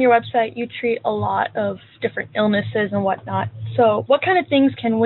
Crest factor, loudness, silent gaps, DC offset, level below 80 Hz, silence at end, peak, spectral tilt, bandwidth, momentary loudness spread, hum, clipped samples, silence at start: 16 dB; -20 LUFS; none; under 0.1%; -60 dBFS; 0 s; -4 dBFS; -4.5 dB/octave; 4.3 kHz; 9 LU; none; under 0.1%; 0 s